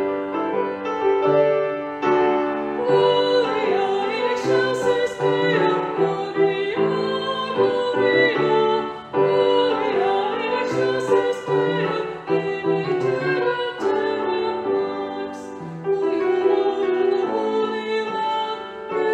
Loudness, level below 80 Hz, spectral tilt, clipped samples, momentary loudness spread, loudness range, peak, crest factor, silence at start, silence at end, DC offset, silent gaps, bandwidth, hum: -21 LUFS; -64 dBFS; -6 dB/octave; under 0.1%; 7 LU; 3 LU; -6 dBFS; 16 dB; 0 s; 0 s; under 0.1%; none; 8.8 kHz; none